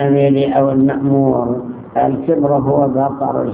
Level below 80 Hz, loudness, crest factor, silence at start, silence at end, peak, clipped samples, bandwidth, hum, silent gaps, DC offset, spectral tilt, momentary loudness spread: -46 dBFS; -15 LUFS; 14 dB; 0 s; 0 s; 0 dBFS; under 0.1%; 3.8 kHz; none; none; under 0.1%; -12.5 dB/octave; 6 LU